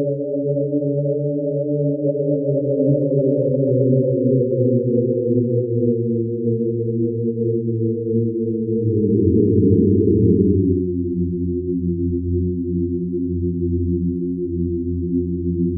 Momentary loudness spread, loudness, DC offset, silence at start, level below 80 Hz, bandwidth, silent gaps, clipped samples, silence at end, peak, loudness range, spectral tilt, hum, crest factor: 7 LU; -19 LUFS; under 0.1%; 0 s; -40 dBFS; 0.7 kHz; none; under 0.1%; 0 s; -2 dBFS; 5 LU; -19 dB/octave; none; 16 dB